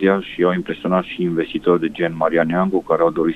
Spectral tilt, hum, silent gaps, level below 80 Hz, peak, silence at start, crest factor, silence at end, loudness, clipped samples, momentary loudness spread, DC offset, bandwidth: -8.5 dB/octave; none; none; -52 dBFS; -2 dBFS; 0 s; 16 dB; 0 s; -19 LUFS; under 0.1%; 4 LU; under 0.1%; 8.4 kHz